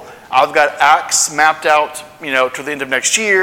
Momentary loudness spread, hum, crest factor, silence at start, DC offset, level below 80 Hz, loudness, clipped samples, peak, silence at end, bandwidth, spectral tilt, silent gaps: 7 LU; none; 14 dB; 0 s; under 0.1%; -60 dBFS; -13 LUFS; under 0.1%; 0 dBFS; 0 s; 19.5 kHz; -0.5 dB/octave; none